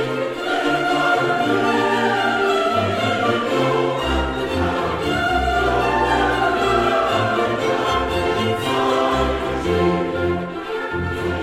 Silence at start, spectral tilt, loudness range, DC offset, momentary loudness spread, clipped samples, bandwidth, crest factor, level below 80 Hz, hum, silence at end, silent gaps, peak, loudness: 0 s; -5.5 dB/octave; 1 LU; under 0.1%; 5 LU; under 0.1%; 16 kHz; 14 dB; -36 dBFS; none; 0 s; none; -6 dBFS; -19 LUFS